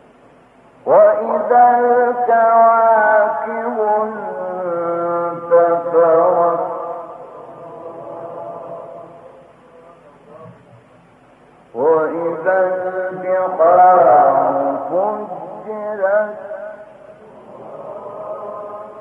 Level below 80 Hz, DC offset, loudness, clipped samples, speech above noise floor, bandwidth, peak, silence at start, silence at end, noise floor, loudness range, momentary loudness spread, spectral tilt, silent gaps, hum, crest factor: -68 dBFS; under 0.1%; -15 LUFS; under 0.1%; 36 dB; 3.4 kHz; -2 dBFS; 0.85 s; 0 s; -48 dBFS; 19 LU; 21 LU; -9 dB/octave; none; none; 14 dB